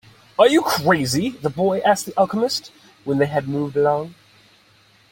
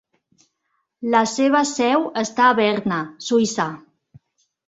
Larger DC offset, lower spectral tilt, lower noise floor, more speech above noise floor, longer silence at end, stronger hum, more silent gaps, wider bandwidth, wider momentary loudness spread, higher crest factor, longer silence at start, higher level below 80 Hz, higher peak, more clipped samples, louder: neither; about the same, -5 dB/octave vs -4 dB/octave; second, -55 dBFS vs -73 dBFS; second, 36 dB vs 54 dB; about the same, 1 s vs 0.9 s; neither; neither; first, 17 kHz vs 8.2 kHz; about the same, 10 LU vs 10 LU; about the same, 18 dB vs 18 dB; second, 0.4 s vs 1 s; first, -58 dBFS vs -64 dBFS; about the same, -2 dBFS vs -2 dBFS; neither; about the same, -19 LUFS vs -19 LUFS